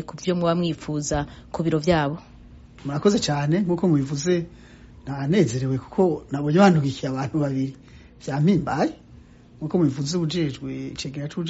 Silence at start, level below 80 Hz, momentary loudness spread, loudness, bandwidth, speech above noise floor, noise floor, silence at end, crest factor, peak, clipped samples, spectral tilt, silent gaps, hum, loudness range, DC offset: 0 s; -48 dBFS; 11 LU; -23 LUFS; 8 kHz; 25 dB; -48 dBFS; 0 s; 18 dB; -4 dBFS; under 0.1%; -6.5 dB/octave; none; none; 3 LU; under 0.1%